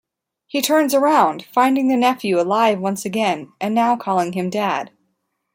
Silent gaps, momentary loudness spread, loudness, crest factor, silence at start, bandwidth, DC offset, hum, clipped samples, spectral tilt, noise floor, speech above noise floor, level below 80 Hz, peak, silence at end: none; 7 LU; -18 LUFS; 16 dB; 0.55 s; 16.5 kHz; under 0.1%; none; under 0.1%; -4.5 dB/octave; -71 dBFS; 53 dB; -68 dBFS; -2 dBFS; 0.7 s